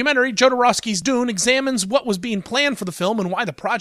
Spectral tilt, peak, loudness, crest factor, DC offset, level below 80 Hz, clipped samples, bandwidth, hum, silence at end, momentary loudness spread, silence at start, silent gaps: -3 dB/octave; -4 dBFS; -19 LUFS; 16 dB; under 0.1%; -58 dBFS; under 0.1%; 15.5 kHz; none; 0 s; 8 LU; 0 s; none